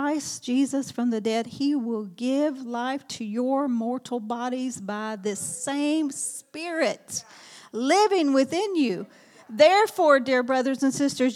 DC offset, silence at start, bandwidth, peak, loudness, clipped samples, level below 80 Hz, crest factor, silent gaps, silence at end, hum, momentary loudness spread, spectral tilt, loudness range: under 0.1%; 0 s; 15 kHz; -6 dBFS; -25 LUFS; under 0.1%; -78 dBFS; 20 dB; none; 0 s; none; 12 LU; -3.5 dB/octave; 7 LU